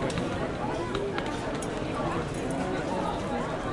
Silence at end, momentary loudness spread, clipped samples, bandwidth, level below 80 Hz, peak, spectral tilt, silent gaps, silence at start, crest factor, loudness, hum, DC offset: 0 s; 2 LU; under 0.1%; 11.5 kHz; -46 dBFS; -14 dBFS; -5.5 dB/octave; none; 0 s; 18 dB; -31 LUFS; none; under 0.1%